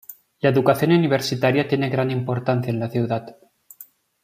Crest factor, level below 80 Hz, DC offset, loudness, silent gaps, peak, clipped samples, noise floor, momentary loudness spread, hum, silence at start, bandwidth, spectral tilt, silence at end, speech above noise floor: 18 dB; -62 dBFS; under 0.1%; -21 LUFS; none; -2 dBFS; under 0.1%; -48 dBFS; 7 LU; none; 0.1 s; 15.5 kHz; -6.5 dB/octave; 0.4 s; 28 dB